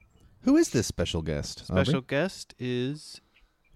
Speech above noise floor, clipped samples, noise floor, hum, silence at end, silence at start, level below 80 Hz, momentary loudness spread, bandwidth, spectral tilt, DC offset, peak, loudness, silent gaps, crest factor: 36 dB; under 0.1%; -63 dBFS; none; 0.55 s; 0.45 s; -48 dBFS; 13 LU; 14.5 kHz; -5.5 dB/octave; under 0.1%; -10 dBFS; -28 LUFS; none; 18 dB